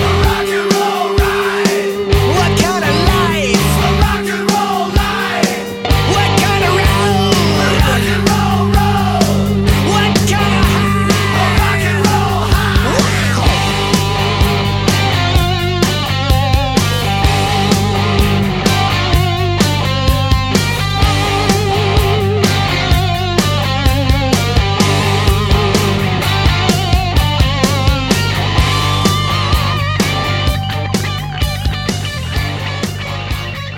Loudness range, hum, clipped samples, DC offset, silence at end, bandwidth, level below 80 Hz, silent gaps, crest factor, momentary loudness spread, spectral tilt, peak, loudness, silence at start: 1 LU; none; under 0.1%; under 0.1%; 0 s; 17 kHz; -22 dBFS; none; 12 dB; 4 LU; -5 dB/octave; 0 dBFS; -13 LUFS; 0 s